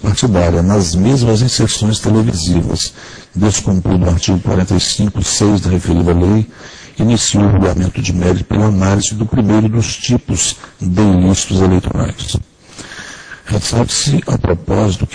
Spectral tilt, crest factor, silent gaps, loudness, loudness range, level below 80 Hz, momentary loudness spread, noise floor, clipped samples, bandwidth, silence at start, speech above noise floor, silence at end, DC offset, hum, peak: -5.5 dB/octave; 12 dB; none; -13 LUFS; 2 LU; -28 dBFS; 9 LU; -33 dBFS; under 0.1%; 10.5 kHz; 0 s; 21 dB; 0 s; under 0.1%; none; 0 dBFS